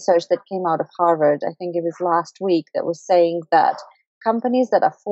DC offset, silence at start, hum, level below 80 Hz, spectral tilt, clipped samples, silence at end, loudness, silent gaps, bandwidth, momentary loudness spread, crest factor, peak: under 0.1%; 0 s; none; -84 dBFS; -6 dB/octave; under 0.1%; 0 s; -20 LUFS; 4.06-4.21 s; 8 kHz; 8 LU; 16 dB; -4 dBFS